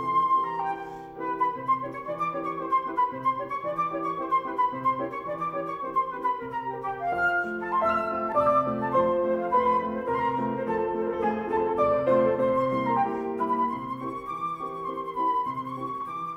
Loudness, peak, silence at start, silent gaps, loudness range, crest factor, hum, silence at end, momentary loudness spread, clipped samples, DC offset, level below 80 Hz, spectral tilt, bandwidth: -27 LUFS; -12 dBFS; 0 s; none; 4 LU; 16 dB; none; 0 s; 9 LU; under 0.1%; under 0.1%; -58 dBFS; -7.5 dB/octave; 15 kHz